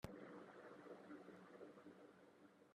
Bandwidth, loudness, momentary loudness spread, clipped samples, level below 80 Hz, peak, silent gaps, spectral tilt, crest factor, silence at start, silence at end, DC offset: 11.5 kHz; -61 LUFS; 9 LU; under 0.1%; -78 dBFS; -30 dBFS; none; -6.5 dB/octave; 30 dB; 0 s; 0 s; under 0.1%